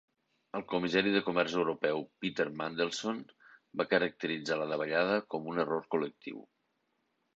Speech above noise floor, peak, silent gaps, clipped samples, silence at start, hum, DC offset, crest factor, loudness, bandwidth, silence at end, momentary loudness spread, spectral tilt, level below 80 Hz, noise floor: 46 dB; -14 dBFS; none; under 0.1%; 0.55 s; none; under 0.1%; 20 dB; -33 LUFS; 8 kHz; 0.95 s; 13 LU; -5 dB/octave; -74 dBFS; -79 dBFS